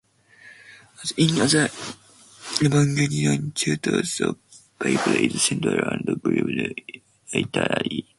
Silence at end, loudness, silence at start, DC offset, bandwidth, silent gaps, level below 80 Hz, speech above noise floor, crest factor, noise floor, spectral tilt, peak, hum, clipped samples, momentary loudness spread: 0.15 s; -22 LUFS; 0.45 s; under 0.1%; 11.5 kHz; none; -58 dBFS; 28 dB; 20 dB; -51 dBFS; -4.5 dB/octave; -4 dBFS; none; under 0.1%; 16 LU